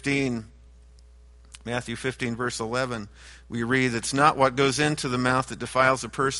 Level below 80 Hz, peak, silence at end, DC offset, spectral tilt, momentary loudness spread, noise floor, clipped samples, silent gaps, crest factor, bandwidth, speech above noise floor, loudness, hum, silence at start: -50 dBFS; -4 dBFS; 0 s; under 0.1%; -4.5 dB/octave; 11 LU; -51 dBFS; under 0.1%; none; 22 dB; 11.5 kHz; 26 dB; -25 LUFS; none; 0.05 s